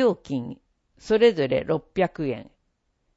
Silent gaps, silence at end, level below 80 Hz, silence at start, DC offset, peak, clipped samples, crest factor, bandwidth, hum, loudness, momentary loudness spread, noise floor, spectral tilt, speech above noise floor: none; 0.75 s; -56 dBFS; 0 s; under 0.1%; -6 dBFS; under 0.1%; 20 dB; 8 kHz; none; -24 LUFS; 12 LU; -72 dBFS; -6.5 dB/octave; 49 dB